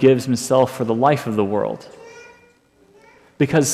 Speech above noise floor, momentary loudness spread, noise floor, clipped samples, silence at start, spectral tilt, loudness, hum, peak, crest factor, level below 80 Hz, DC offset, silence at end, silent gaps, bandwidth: 37 dB; 21 LU; -55 dBFS; under 0.1%; 0 s; -5.5 dB/octave; -19 LUFS; none; -2 dBFS; 16 dB; -60 dBFS; under 0.1%; 0 s; none; 15 kHz